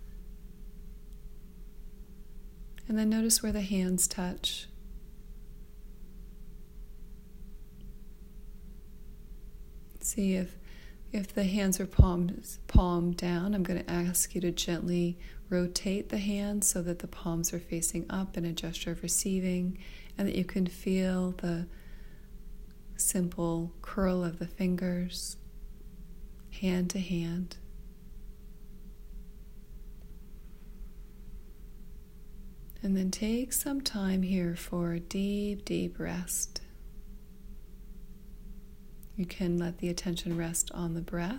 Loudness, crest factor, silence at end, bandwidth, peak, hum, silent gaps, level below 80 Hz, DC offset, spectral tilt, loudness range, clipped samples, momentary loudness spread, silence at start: -32 LUFS; 28 dB; 0 s; 16 kHz; -6 dBFS; none; none; -42 dBFS; under 0.1%; -4.5 dB/octave; 22 LU; under 0.1%; 25 LU; 0 s